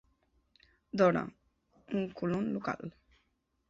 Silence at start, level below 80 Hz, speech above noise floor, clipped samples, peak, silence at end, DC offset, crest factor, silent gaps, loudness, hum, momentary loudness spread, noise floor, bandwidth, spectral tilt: 0.95 s; -68 dBFS; 46 dB; under 0.1%; -14 dBFS; 0.8 s; under 0.1%; 22 dB; none; -33 LUFS; none; 14 LU; -77 dBFS; 7.6 kHz; -6.5 dB/octave